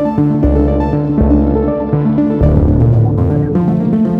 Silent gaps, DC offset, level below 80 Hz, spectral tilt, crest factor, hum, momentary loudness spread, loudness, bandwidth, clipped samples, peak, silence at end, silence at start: none; under 0.1%; -20 dBFS; -11.5 dB/octave; 12 dB; none; 4 LU; -12 LUFS; 4.7 kHz; under 0.1%; 0 dBFS; 0 s; 0 s